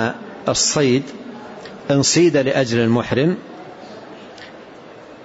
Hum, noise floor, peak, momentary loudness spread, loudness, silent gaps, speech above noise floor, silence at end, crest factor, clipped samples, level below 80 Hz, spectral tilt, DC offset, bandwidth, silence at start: none; -39 dBFS; -4 dBFS; 23 LU; -17 LUFS; none; 23 dB; 0 s; 16 dB; under 0.1%; -54 dBFS; -4 dB/octave; under 0.1%; 8 kHz; 0 s